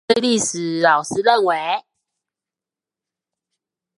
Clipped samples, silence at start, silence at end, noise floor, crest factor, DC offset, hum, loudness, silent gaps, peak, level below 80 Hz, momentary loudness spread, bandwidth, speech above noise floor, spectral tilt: under 0.1%; 0.1 s; 2.2 s; -89 dBFS; 20 dB; under 0.1%; none; -18 LUFS; none; 0 dBFS; -68 dBFS; 6 LU; 11.5 kHz; 71 dB; -3 dB/octave